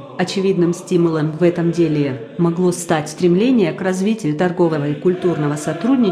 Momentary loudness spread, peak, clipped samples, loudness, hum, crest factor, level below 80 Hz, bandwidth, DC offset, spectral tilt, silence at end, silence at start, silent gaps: 5 LU; -4 dBFS; under 0.1%; -17 LUFS; none; 14 dB; -58 dBFS; 13.5 kHz; under 0.1%; -6.5 dB/octave; 0 s; 0 s; none